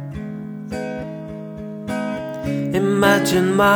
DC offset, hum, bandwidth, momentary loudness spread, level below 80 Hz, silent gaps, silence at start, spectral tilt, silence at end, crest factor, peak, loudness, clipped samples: under 0.1%; none; over 20 kHz; 16 LU; -46 dBFS; none; 0 s; -5.5 dB/octave; 0 s; 18 dB; -2 dBFS; -21 LUFS; under 0.1%